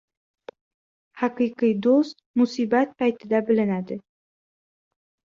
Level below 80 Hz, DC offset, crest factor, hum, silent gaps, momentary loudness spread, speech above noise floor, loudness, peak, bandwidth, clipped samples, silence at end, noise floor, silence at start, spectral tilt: -70 dBFS; under 0.1%; 16 dB; none; 2.26-2.34 s; 8 LU; over 68 dB; -23 LUFS; -8 dBFS; 7.4 kHz; under 0.1%; 1.4 s; under -90 dBFS; 1.15 s; -7 dB/octave